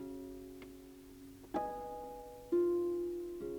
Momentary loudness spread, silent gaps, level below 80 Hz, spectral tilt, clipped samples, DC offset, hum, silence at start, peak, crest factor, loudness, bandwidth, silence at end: 21 LU; none; -64 dBFS; -7 dB/octave; under 0.1%; under 0.1%; none; 0 s; -24 dBFS; 16 dB; -39 LUFS; over 20 kHz; 0 s